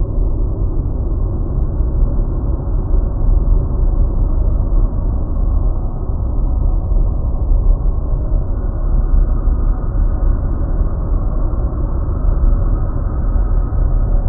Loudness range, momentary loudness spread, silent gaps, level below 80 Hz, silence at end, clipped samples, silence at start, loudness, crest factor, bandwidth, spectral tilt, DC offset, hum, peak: 1 LU; 3 LU; none; -14 dBFS; 0 s; under 0.1%; 0 s; -19 LUFS; 12 dB; 1.6 kHz; -10.5 dB/octave; under 0.1%; none; -2 dBFS